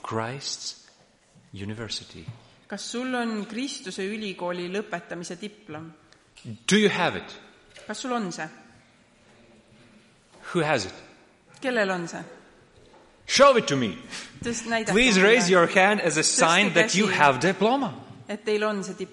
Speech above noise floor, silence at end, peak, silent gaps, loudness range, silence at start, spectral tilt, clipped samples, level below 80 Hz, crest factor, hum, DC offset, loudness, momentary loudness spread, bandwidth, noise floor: 34 dB; 0.05 s; -2 dBFS; none; 14 LU; 0.05 s; -3.5 dB/octave; under 0.1%; -58 dBFS; 24 dB; none; under 0.1%; -23 LUFS; 21 LU; 11.5 kHz; -58 dBFS